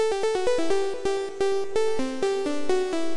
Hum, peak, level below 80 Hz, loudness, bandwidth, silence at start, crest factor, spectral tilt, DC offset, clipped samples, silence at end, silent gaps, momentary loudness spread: none; -12 dBFS; -54 dBFS; -26 LUFS; 11.5 kHz; 0 s; 12 dB; -4 dB/octave; under 0.1%; under 0.1%; 0 s; none; 3 LU